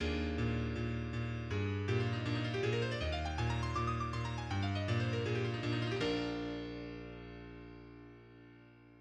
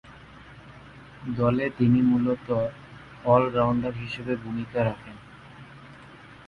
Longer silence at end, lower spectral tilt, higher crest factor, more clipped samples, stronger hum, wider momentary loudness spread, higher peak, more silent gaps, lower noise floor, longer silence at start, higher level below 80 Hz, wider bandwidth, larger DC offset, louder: about the same, 0 s vs 0.05 s; second, -6.5 dB/octave vs -9 dB/octave; about the same, 16 dB vs 20 dB; neither; neither; second, 16 LU vs 26 LU; second, -22 dBFS vs -6 dBFS; neither; first, -59 dBFS vs -47 dBFS; about the same, 0 s vs 0.05 s; about the same, -50 dBFS vs -54 dBFS; first, 9 kHz vs 5.6 kHz; neither; second, -37 LUFS vs -25 LUFS